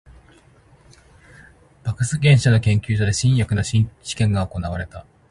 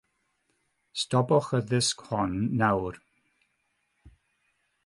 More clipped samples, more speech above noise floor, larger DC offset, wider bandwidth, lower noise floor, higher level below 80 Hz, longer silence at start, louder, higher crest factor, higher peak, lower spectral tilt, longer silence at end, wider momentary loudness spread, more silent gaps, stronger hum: neither; second, 33 dB vs 49 dB; neither; about the same, 11.5 kHz vs 11.5 kHz; second, -52 dBFS vs -75 dBFS; first, -40 dBFS vs -56 dBFS; first, 1.85 s vs 0.95 s; first, -20 LUFS vs -27 LUFS; about the same, 18 dB vs 20 dB; first, -2 dBFS vs -10 dBFS; about the same, -5.5 dB/octave vs -5 dB/octave; second, 0.3 s vs 0.75 s; first, 14 LU vs 9 LU; neither; neither